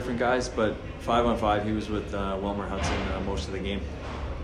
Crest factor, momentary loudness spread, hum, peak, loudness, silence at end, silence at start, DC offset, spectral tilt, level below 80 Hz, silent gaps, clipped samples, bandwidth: 16 dB; 9 LU; none; -12 dBFS; -29 LUFS; 0 s; 0 s; under 0.1%; -5.5 dB/octave; -38 dBFS; none; under 0.1%; 12 kHz